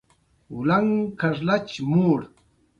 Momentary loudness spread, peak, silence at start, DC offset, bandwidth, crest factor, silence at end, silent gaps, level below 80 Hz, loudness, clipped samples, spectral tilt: 6 LU; -8 dBFS; 0.5 s; under 0.1%; 7.6 kHz; 16 dB; 0.55 s; none; -58 dBFS; -23 LUFS; under 0.1%; -8 dB/octave